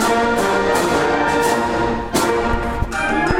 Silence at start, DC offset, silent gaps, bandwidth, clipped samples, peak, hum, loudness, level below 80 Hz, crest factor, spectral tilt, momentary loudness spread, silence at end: 0 s; under 0.1%; none; 16.5 kHz; under 0.1%; -2 dBFS; none; -17 LUFS; -30 dBFS; 14 dB; -4.5 dB/octave; 4 LU; 0 s